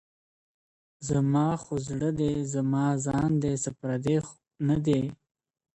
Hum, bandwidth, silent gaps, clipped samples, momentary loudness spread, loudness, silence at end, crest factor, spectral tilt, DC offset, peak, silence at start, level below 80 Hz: none; 8.8 kHz; none; under 0.1%; 7 LU; -28 LUFS; 0.6 s; 16 dB; -7 dB/octave; under 0.1%; -14 dBFS; 1 s; -54 dBFS